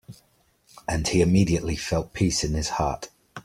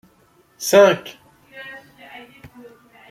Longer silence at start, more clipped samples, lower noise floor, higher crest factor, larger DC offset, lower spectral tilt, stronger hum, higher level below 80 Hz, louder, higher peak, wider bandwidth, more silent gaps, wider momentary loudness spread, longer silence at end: second, 0.1 s vs 0.6 s; neither; first, -64 dBFS vs -56 dBFS; about the same, 18 dB vs 20 dB; neither; first, -5 dB/octave vs -3.5 dB/octave; neither; first, -40 dBFS vs -64 dBFS; second, -24 LUFS vs -16 LUFS; second, -8 dBFS vs -2 dBFS; about the same, 15.5 kHz vs 16 kHz; neither; second, 13 LU vs 27 LU; second, 0.05 s vs 1.35 s